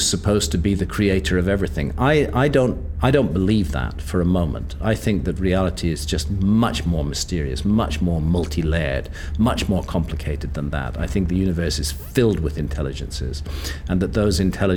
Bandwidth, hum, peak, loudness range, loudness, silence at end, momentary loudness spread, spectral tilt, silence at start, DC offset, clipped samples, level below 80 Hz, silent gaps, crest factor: 19 kHz; none; -2 dBFS; 4 LU; -21 LUFS; 0 s; 8 LU; -5.5 dB/octave; 0 s; under 0.1%; under 0.1%; -28 dBFS; none; 18 dB